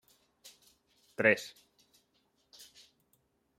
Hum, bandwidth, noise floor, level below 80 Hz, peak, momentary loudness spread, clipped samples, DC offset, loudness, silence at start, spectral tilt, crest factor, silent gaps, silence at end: none; 16 kHz; -75 dBFS; -84 dBFS; -10 dBFS; 27 LU; under 0.1%; under 0.1%; -29 LUFS; 1.2 s; -4.5 dB/octave; 30 dB; none; 2.1 s